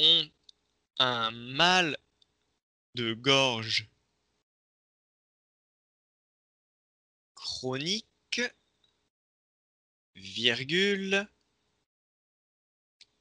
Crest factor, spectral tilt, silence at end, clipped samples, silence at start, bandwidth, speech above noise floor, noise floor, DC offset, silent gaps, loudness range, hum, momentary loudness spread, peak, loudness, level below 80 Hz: 26 dB; -3 dB/octave; 1.95 s; under 0.1%; 0 s; 11 kHz; 48 dB; -76 dBFS; under 0.1%; 2.63-2.93 s, 4.42-7.35 s, 9.10-10.13 s; 11 LU; none; 17 LU; -6 dBFS; -28 LUFS; -74 dBFS